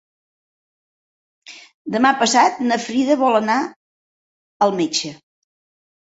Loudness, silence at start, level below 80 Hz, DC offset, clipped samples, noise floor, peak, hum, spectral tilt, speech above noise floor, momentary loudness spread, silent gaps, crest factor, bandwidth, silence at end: -18 LUFS; 1.5 s; -68 dBFS; under 0.1%; under 0.1%; under -90 dBFS; -2 dBFS; none; -3 dB/octave; over 73 dB; 11 LU; 1.74-1.85 s, 3.76-4.60 s; 20 dB; 8 kHz; 1 s